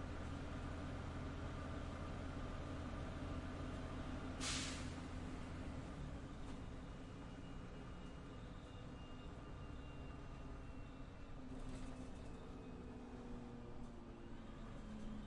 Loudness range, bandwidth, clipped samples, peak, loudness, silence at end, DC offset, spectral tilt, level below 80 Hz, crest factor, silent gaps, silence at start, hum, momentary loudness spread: 7 LU; 11 kHz; under 0.1%; -32 dBFS; -51 LUFS; 0 s; under 0.1%; -5 dB/octave; -54 dBFS; 18 dB; none; 0 s; none; 6 LU